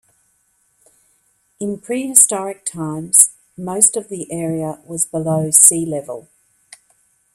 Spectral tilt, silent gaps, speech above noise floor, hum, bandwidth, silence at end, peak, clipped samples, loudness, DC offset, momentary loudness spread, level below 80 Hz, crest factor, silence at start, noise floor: -4 dB/octave; none; 45 dB; none; over 20 kHz; 1.15 s; 0 dBFS; 0.1%; -14 LUFS; under 0.1%; 17 LU; -62 dBFS; 20 dB; 1.6 s; -62 dBFS